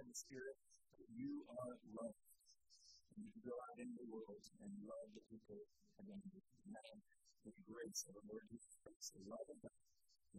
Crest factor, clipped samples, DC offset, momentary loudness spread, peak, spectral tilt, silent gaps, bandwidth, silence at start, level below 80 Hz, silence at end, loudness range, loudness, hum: 24 dB; under 0.1%; under 0.1%; 14 LU; -34 dBFS; -3.5 dB/octave; 8.96-9.00 s; 13 kHz; 0 s; -86 dBFS; 0 s; 4 LU; -56 LUFS; none